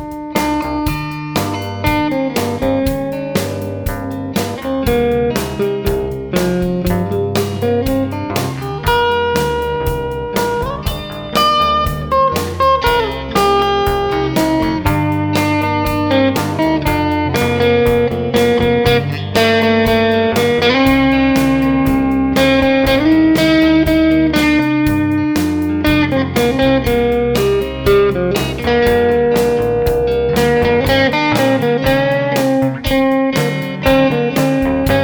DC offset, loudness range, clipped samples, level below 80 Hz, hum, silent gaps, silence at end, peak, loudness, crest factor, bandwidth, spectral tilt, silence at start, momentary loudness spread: under 0.1%; 6 LU; under 0.1%; -30 dBFS; none; none; 0 s; 0 dBFS; -14 LUFS; 14 dB; over 20 kHz; -6 dB/octave; 0 s; 7 LU